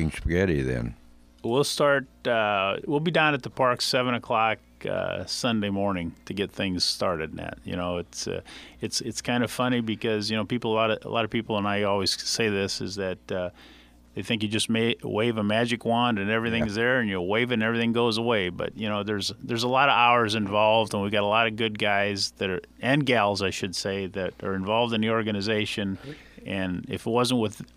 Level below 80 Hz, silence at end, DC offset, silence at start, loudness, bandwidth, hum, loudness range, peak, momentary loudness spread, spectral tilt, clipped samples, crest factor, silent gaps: -50 dBFS; 0.1 s; under 0.1%; 0 s; -25 LUFS; 15.5 kHz; none; 5 LU; -6 dBFS; 10 LU; -4.5 dB/octave; under 0.1%; 20 dB; none